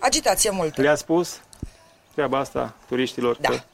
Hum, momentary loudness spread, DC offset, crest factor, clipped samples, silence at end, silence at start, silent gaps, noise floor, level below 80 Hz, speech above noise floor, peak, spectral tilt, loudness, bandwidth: none; 17 LU; under 0.1%; 18 dB; under 0.1%; 0.1 s; 0 s; none; -49 dBFS; -46 dBFS; 26 dB; -6 dBFS; -3 dB/octave; -23 LUFS; 16 kHz